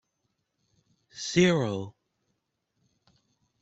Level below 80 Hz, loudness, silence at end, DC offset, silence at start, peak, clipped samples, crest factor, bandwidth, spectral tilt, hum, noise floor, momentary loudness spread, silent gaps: -66 dBFS; -26 LUFS; 1.7 s; under 0.1%; 1.15 s; -8 dBFS; under 0.1%; 24 dB; 8.2 kHz; -5 dB/octave; none; -79 dBFS; 21 LU; none